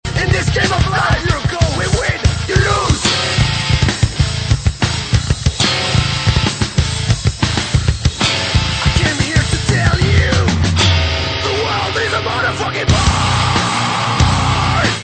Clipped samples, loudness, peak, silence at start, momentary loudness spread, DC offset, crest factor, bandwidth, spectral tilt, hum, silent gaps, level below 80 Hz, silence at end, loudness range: under 0.1%; -15 LUFS; 0 dBFS; 0.05 s; 4 LU; under 0.1%; 14 dB; 9.2 kHz; -4 dB/octave; none; none; -24 dBFS; 0 s; 1 LU